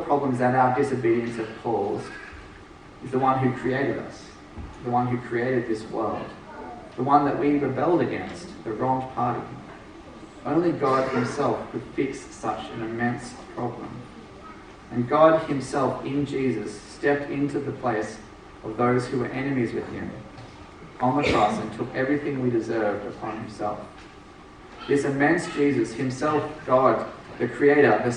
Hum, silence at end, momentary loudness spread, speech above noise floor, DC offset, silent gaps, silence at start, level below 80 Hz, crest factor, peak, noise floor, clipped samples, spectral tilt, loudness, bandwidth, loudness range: none; 0 s; 21 LU; 22 dB; under 0.1%; none; 0 s; -52 dBFS; 20 dB; -4 dBFS; -46 dBFS; under 0.1%; -6.5 dB/octave; -25 LUFS; 10.5 kHz; 4 LU